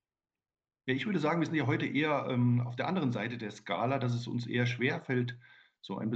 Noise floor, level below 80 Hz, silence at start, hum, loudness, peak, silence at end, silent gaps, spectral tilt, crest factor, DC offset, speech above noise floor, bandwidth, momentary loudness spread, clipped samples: under -90 dBFS; -74 dBFS; 0.85 s; none; -32 LUFS; -16 dBFS; 0 s; none; -7 dB/octave; 16 dB; under 0.1%; over 58 dB; 7.8 kHz; 9 LU; under 0.1%